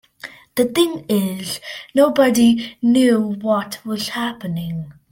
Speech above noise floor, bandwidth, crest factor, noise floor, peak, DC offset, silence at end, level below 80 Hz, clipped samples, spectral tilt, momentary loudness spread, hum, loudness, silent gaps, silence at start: 22 dB; 17 kHz; 16 dB; -40 dBFS; -2 dBFS; under 0.1%; 0.2 s; -56 dBFS; under 0.1%; -5 dB/octave; 13 LU; none; -18 LUFS; none; 0.25 s